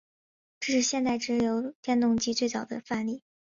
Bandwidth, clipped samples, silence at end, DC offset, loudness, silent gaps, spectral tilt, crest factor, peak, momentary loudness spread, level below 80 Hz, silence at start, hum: 7.6 kHz; under 0.1%; 0.35 s; under 0.1%; -28 LUFS; 1.75-1.83 s; -3 dB/octave; 14 dB; -14 dBFS; 10 LU; -64 dBFS; 0.6 s; none